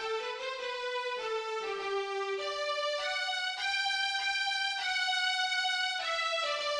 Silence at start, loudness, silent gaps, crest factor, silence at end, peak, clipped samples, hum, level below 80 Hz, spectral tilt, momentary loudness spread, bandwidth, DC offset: 0 s; -31 LUFS; none; 14 dB; 0 s; -20 dBFS; under 0.1%; none; -74 dBFS; 1 dB/octave; 6 LU; 14.5 kHz; under 0.1%